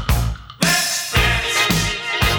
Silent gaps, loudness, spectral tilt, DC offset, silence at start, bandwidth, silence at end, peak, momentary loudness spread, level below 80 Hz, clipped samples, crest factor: none; -17 LUFS; -3 dB/octave; under 0.1%; 0 s; over 20 kHz; 0 s; -2 dBFS; 5 LU; -26 dBFS; under 0.1%; 16 dB